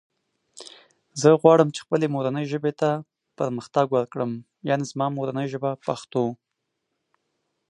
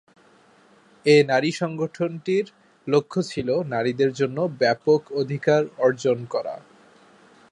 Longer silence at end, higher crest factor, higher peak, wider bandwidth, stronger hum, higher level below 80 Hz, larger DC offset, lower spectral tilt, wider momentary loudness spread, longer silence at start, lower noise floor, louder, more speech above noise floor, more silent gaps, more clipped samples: first, 1.35 s vs 0.95 s; about the same, 22 dB vs 18 dB; about the same, -2 dBFS vs -4 dBFS; about the same, 11 kHz vs 11 kHz; neither; second, -72 dBFS vs -66 dBFS; neither; about the same, -6.5 dB/octave vs -6 dB/octave; first, 15 LU vs 10 LU; second, 0.55 s vs 1.05 s; first, -79 dBFS vs -55 dBFS; about the same, -24 LUFS vs -23 LUFS; first, 56 dB vs 34 dB; neither; neither